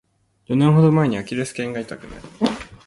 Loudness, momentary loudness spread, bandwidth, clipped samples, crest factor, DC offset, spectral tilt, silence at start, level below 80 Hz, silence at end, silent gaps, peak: -20 LUFS; 18 LU; 11.5 kHz; under 0.1%; 16 dB; under 0.1%; -7.5 dB/octave; 0.5 s; -50 dBFS; 0.1 s; none; -4 dBFS